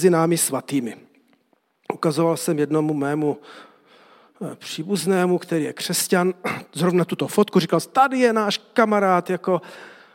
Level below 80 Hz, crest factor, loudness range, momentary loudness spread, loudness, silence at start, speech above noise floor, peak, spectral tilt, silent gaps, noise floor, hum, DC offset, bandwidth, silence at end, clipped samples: -74 dBFS; 20 dB; 5 LU; 13 LU; -21 LUFS; 0 s; 44 dB; -2 dBFS; -5 dB/octave; none; -65 dBFS; none; under 0.1%; 17 kHz; 0.2 s; under 0.1%